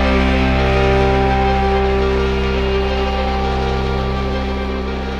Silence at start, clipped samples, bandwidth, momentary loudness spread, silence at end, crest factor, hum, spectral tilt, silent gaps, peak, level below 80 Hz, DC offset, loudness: 0 s; under 0.1%; 7.8 kHz; 6 LU; 0 s; 14 dB; none; -7 dB/octave; none; 0 dBFS; -20 dBFS; under 0.1%; -17 LUFS